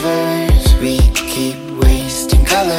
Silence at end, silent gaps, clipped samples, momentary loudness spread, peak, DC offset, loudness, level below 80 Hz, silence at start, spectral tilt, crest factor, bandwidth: 0 s; none; under 0.1%; 6 LU; 0 dBFS; under 0.1%; -14 LUFS; -14 dBFS; 0 s; -5 dB/octave; 12 dB; 16.5 kHz